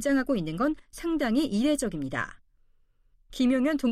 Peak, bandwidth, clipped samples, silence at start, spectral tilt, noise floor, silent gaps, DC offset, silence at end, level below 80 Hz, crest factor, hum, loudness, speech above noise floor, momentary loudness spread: -16 dBFS; 15 kHz; under 0.1%; 0 s; -5 dB/octave; -63 dBFS; none; under 0.1%; 0 s; -50 dBFS; 12 dB; none; -28 LUFS; 37 dB; 9 LU